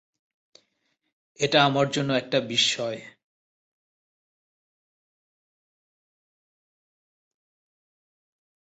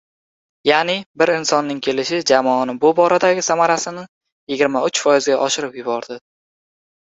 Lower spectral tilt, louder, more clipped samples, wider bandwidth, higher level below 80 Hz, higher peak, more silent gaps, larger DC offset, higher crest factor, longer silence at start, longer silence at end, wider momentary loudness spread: about the same, -3.5 dB/octave vs -3 dB/octave; second, -23 LUFS vs -17 LUFS; neither; about the same, 8.4 kHz vs 8.2 kHz; second, -72 dBFS vs -64 dBFS; second, -8 dBFS vs 0 dBFS; second, none vs 1.06-1.14 s, 4.08-4.21 s, 4.32-4.47 s; neither; first, 24 dB vs 18 dB; first, 1.4 s vs 0.65 s; first, 5.65 s vs 0.85 s; about the same, 10 LU vs 10 LU